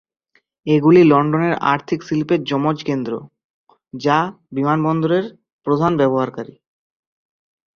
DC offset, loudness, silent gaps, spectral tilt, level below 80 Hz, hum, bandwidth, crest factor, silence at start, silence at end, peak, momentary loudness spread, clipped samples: under 0.1%; -17 LUFS; 3.44-3.67 s, 5.53-5.59 s; -8 dB/octave; -58 dBFS; none; 6.8 kHz; 18 dB; 0.65 s; 1.3 s; -2 dBFS; 17 LU; under 0.1%